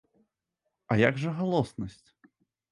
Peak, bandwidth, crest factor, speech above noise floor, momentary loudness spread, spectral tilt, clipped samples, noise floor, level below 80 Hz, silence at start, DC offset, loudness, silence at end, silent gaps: -8 dBFS; 11.5 kHz; 22 dB; 55 dB; 14 LU; -7.5 dB/octave; under 0.1%; -83 dBFS; -60 dBFS; 0.9 s; under 0.1%; -28 LUFS; 0.8 s; none